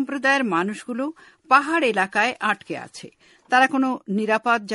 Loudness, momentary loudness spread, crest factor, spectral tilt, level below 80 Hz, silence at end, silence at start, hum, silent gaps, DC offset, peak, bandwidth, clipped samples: -21 LUFS; 13 LU; 20 dB; -4.5 dB/octave; -70 dBFS; 0 s; 0 s; none; none; under 0.1%; -2 dBFS; 11.5 kHz; under 0.1%